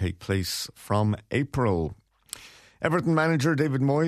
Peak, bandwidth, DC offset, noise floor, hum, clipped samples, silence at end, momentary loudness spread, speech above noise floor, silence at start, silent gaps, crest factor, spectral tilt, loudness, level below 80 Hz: -8 dBFS; 14 kHz; under 0.1%; -45 dBFS; none; under 0.1%; 0 s; 15 LU; 20 dB; 0 s; none; 18 dB; -6 dB/octave; -26 LUFS; -50 dBFS